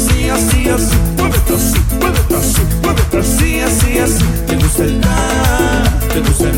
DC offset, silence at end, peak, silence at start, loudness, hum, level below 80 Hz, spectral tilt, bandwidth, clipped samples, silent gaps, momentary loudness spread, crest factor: under 0.1%; 0 s; 0 dBFS; 0 s; -13 LUFS; none; -16 dBFS; -4.5 dB/octave; 17 kHz; under 0.1%; none; 2 LU; 12 dB